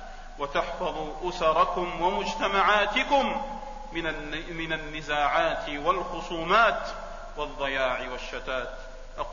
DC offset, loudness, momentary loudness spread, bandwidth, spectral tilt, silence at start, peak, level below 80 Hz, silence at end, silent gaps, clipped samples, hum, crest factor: under 0.1%; -27 LUFS; 15 LU; 7.4 kHz; -4 dB/octave; 0 s; -10 dBFS; -42 dBFS; 0 s; none; under 0.1%; none; 18 dB